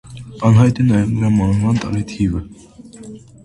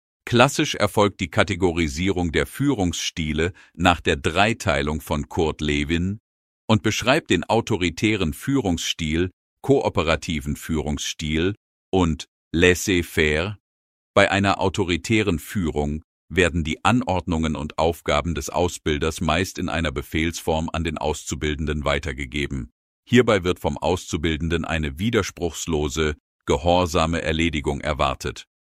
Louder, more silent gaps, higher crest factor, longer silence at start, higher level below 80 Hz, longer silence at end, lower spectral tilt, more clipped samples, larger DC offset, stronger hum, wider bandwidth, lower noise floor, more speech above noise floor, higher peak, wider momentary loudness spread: first, -16 LUFS vs -22 LUFS; second, none vs 6.20-6.68 s, 9.33-9.57 s, 11.57-11.92 s, 12.28-12.51 s, 13.60-14.14 s, 16.04-16.28 s, 22.72-23.03 s, 26.20-26.39 s; second, 16 dB vs 22 dB; second, 0.1 s vs 0.25 s; about the same, -36 dBFS vs -36 dBFS; about the same, 0.25 s vs 0.2 s; first, -8 dB/octave vs -5 dB/octave; neither; neither; neither; second, 11 kHz vs 15.5 kHz; second, -36 dBFS vs under -90 dBFS; second, 21 dB vs over 68 dB; about the same, 0 dBFS vs 0 dBFS; first, 23 LU vs 8 LU